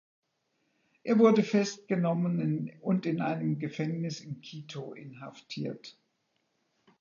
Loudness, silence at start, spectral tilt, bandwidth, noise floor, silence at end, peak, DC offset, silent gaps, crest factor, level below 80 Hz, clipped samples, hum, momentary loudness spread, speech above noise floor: -29 LUFS; 1.05 s; -7 dB/octave; 7.4 kHz; -77 dBFS; 1.1 s; -10 dBFS; under 0.1%; none; 20 dB; -80 dBFS; under 0.1%; none; 20 LU; 48 dB